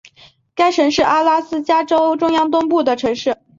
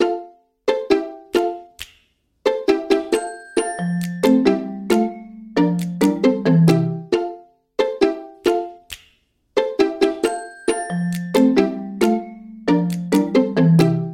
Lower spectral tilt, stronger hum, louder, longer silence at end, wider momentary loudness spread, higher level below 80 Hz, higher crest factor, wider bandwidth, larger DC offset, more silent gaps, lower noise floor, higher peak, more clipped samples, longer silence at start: second, -4 dB/octave vs -6.5 dB/octave; neither; first, -16 LUFS vs -19 LUFS; first, 0.25 s vs 0 s; second, 5 LU vs 12 LU; about the same, -54 dBFS vs -56 dBFS; about the same, 14 dB vs 18 dB; second, 7.6 kHz vs 16.5 kHz; neither; neither; second, -48 dBFS vs -61 dBFS; about the same, -2 dBFS vs -2 dBFS; neither; first, 0.55 s vs 0 s